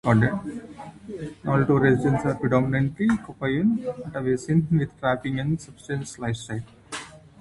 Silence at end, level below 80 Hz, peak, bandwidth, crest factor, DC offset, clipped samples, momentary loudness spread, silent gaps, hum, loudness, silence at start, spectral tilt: 0.25 s; -50 dBFS; -6 dBFS; 11.5 kHz; 20 dB; under 0.1%; under 0.1%; 16 LU; none; none; -24 LUFS; 0.05 s; -7.5 dB/octave